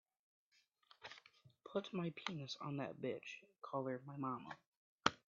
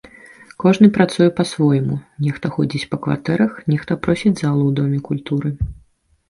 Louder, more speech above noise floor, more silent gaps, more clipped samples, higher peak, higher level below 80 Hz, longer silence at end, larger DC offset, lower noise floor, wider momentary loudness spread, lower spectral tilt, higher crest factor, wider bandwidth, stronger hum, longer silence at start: second, -46 LUFS vs -18 LUFS; about the same, 28 dB vs 26 dB; first, 4.66-4.98 s vs none; neither; second, -12 dBFS vs 0 dBFS; second, -84 dBFS vs -40 dBFS; second, 0.15 s vs 0.55 s; neither; first, -73 dBFS vs -43 dBFS; first, 14 LU vs 10 LU; second, -3.5 dB/octave vs -7.5 dB/octave; first, 34 dB vs 18 dB; second, 7.4 kHz vs 11.5 kHz; neither; first, 1 s vs 0.6 s